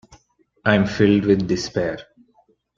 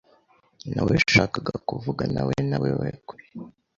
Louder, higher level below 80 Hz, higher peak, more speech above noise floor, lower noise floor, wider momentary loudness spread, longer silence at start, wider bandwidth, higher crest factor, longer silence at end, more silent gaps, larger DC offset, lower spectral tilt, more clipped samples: first, -19 LUFS vs -24 LUFS; about the same, -50 dBFS vs -48 dBFS; about the same, -2 dBFS vs -4 dBFS; first, 42 dB vs 37 dB; about the same, -61 dBFS vs -61 dBFS; second, 9 LU vs 23 LU; second, 0.1 s vs 0.65 s; about the same, 7.6 kHz vs 7.6 kHz; about the same, 20 dB vs 22 dB; first, 0.75 s vs 0.3 s; neither; neither; about the same, -6.5 dB/octave vs -5.5 dB/octave; neither